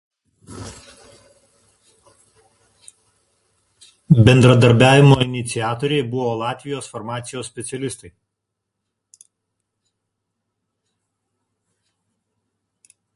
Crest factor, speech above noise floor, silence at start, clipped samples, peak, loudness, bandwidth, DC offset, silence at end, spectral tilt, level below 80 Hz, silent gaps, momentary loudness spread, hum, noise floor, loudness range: 20 dB; 64 dB; 0.5 s; under 0.1%; 0 dBFS; -16 LUFS; 11.5 kHz; under 0.1%; 5.1 s; -6 dB/octave; -48 dBFS; none; 22 LU; none; -79 dBFS; 19 LU